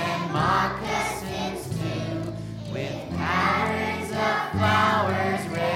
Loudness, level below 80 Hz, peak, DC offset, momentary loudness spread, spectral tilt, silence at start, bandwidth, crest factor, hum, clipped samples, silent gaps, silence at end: -25 LUFS; -48 dBFS; -8 dBFS; under 0.1%; 10 LU; -5 dB/octave; 0 s; 16.5 kHz; 18 dB; none; under 0.1%; none; 0 s